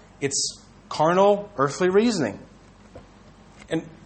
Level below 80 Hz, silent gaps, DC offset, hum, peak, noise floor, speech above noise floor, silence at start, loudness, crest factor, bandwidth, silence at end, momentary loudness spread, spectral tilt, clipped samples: -56 dBFS; none; under 0.1%; none; -6 dBFS; -50 dBFS; 28 dB; 0.2 s; -22 LUFS; 18 dB; 9 kHz; 0.2 s; 12 LU; -4 dB/octave; under 0.1%